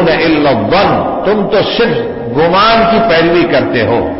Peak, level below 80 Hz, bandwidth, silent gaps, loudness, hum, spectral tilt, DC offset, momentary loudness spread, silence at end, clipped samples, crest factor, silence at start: 0 dBFS; -34 dBFS; 5.8 kHz; none; -10 LUFS; none; -9 dB/octave; under 0.1%; 5 LU; 0 s; under 0.1%; 8 dB; 0 s